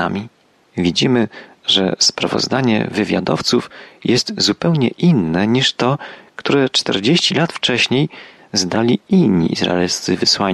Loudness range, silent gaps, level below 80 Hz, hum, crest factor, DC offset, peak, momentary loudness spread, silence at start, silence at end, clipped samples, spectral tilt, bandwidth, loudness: 1 LU; none; -52 dBFS; none; 14 dB; under 0.1%; -2 dBFS; 9 LU; 0 s; 0 s; under 0.1%; -4.5 dB/octave; 12.5 kHz; -16 LUFS